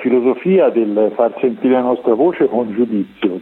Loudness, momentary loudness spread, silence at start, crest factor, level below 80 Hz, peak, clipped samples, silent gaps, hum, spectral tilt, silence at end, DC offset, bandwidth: -15 LUFS; 5 LU; 0 s; 12 dB; -62 dBFS; -2 dBFS; under 0.1%; none; none; -10 dB/octave; 0 s; under 0.1%; 4.1 kHz